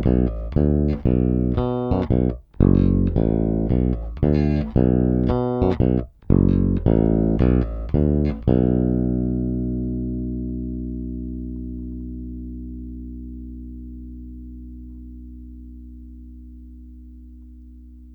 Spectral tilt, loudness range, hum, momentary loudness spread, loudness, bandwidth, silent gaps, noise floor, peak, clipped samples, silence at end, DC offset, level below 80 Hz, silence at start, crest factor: -12 dB/octave; 20 LU; 60 Hz at -45 dBFS; 21 LU; -21 LUFS; 5.2 kHz; none; -42 dBFS; 0 dBFS; under 0.1%; 0 s; under 0.1%; -28 dBFS; 0 s; 20 dB